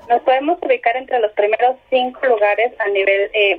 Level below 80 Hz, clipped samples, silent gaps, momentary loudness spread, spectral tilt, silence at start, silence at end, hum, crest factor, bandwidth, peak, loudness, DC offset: -60 dBFS; under 0.1%; none; 4 LU; -5 dB/octave; 0.1 s; 0 s; none; 14 dB; 4.9 kHz; -2 dBFS; -16 LUFS; under 0.1%